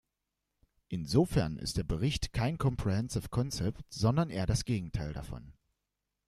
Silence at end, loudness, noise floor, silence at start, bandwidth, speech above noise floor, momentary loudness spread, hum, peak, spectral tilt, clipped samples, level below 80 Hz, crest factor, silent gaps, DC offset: 0.75 s; -33 LUFS; -86 dBFS; 0.9 s; 14 kHz; 54 dB; 11 LU; none; -12 dBFS; -6 dB/octave; under 0.1%; -46 dBFS; 20 dB; none; under 0.1%